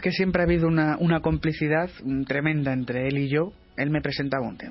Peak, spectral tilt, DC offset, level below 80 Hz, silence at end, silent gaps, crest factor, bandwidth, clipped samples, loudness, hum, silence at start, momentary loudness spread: -8 dBFS; -10.5 dB/octave; under 0.1%; -44 dBFS; 0 s; none; 16 dB; 5.8 kHz; under 0.1%; -25 LUFS; none; 0 s; 7 LU